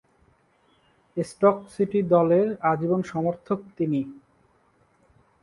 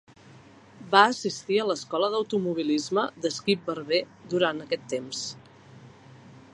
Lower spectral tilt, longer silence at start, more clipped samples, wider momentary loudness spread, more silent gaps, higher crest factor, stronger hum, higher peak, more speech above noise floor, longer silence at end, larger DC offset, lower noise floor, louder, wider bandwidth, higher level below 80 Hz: first, -8.5 dB/octave vs -4 dB/octave; first, 1.15 s vs 0.3 s; neither; about the same, 12 LU vs 11 LU; neither; second, 20 dB vs 26 dB; neither; second, -6 dBFS vs -2 dBFS; first, 40 dB vs 25 dB; first, 1.25 s vs 0.15 s; neither; first, -64 dBFS vs -51 dBFS; about the same, -24 LUFS vs -26 LUFS; about the same, 11.5 kHz vs 11 kHz; first, -64 dBFS vs -70 dBFS